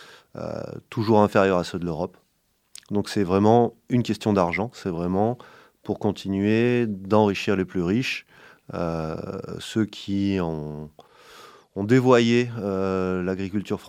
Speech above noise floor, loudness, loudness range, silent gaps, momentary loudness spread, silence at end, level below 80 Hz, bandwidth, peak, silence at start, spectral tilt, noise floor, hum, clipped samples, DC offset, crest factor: 46 dB; -24 LUFS; 5 LU; none; 15 LU; 0 s; -56 dBFS; 15 kHz; -2 dBFS; 0 s; -7 dB/octave; -69 dBFS; none; under 0.1%; under 0.1%; 22 dB